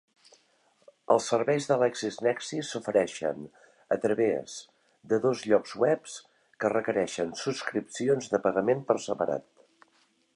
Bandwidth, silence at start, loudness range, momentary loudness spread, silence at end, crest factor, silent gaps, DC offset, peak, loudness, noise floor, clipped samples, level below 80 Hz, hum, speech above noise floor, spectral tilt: 11.5 kHz; 1.1 s; 1 LU; 9 LU; 0.95 s; 22 dB; none; under 0.1%; -8 dBFS; -28 LUFS; -68 dBFS; under 0.1%; -72 dBFS; none; 40 dB; -4.5 dB/octave